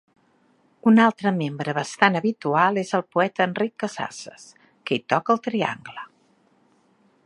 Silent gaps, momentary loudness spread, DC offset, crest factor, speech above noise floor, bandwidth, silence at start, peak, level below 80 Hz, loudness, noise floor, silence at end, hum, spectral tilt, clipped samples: none; 19 LU; under 0.1%; 22 dB; 40 dB; 11 kHz; 0.85 s; -2 dBFS; -74 dBFS; -22 LUFS; -62 dBFS; 1.2 s; none; -5.5 dB/octave; under 0.1%